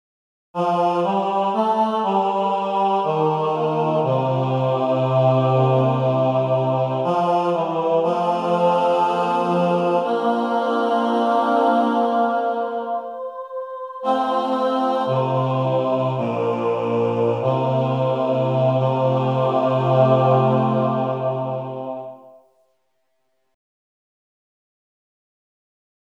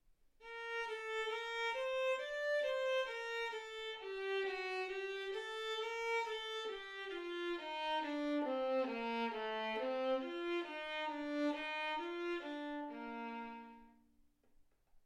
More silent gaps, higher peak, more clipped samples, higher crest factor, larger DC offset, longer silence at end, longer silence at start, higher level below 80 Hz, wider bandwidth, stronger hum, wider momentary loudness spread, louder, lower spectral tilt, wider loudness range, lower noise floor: neither; first, -4 dBFS vs -28 dBFS; neither; about the same, 16 dB vs 14 dB; neither; first, 3.8 s vs 0.05 s; first, 0.55 s vs 0.4 s; about the same, -76 dBFS vs -74 dBFS; second, 9.6 kHz vs 13.5 kHz; neither; about the same, 7 LU vs 8 LU; first, -20 LUFS vs -41 LUFS; first, -8.5 dB/octave vs -2.5 dB/octave; about the same, 4 LU vs 3 LU; about the same, -72 dBFS vs -71 dBFS